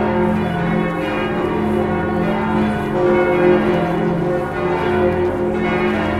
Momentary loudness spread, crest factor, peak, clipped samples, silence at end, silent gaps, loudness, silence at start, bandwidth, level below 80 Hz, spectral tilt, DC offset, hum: 5 LU; 14 dB; -2 dBFS; under 0.1%; 0 s; none; -18 LUFS; 0 s; 12 kHz; -38 dBFS; -8 dB/octave; under 0.1%; none